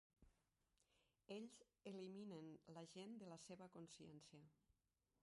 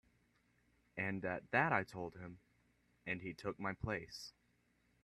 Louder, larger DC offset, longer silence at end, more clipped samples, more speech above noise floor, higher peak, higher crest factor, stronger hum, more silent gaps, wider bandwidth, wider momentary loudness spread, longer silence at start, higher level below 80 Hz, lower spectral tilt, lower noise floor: second, -60 LUFS vs -41 LUFS; neither; second, 0.5 s vs 0.75 s; neither; second, 30 dB vs 36 dB; second, -44 dBFS vs -18 dBFS; second, 18 dB vs 26 dB; second, none vs 60 Hz at -75 dBFS; neither; second, 11.5 kHz vs 13 kHz; second, 7 LU vs 18 LU; second, 0.2 s vs 0.95 s; second, -88 dBFS vs -68 dBFS; about the same, -5 dB/octave vs -6 dB/octave; first, -90 dBFS vs -77 dBFS